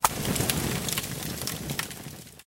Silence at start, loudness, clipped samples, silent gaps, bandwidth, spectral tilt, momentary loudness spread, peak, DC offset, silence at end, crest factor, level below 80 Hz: 0 s; -29 LUFS; under 0.1%; none; 17 kHz; -3 dB/octave; 14 LU; -2 dBFS; under 0.1%; 0.15 s; 28 dB; -46 dBFS